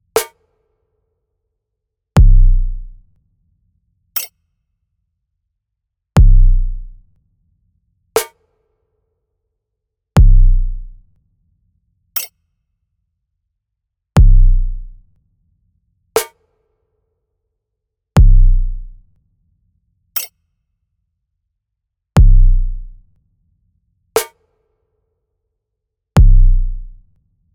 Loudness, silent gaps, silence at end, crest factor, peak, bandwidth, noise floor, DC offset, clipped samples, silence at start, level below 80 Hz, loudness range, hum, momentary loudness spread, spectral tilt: -16 LUFS; none; 0.7 s; 14 dB; 0 dBFS; 17.5 kHz; -77 dBFS; under 0.1%; under 0.1%; 0.15 s; -16 dBFS; 9 LU; none; 18 LU; -6 dB/octave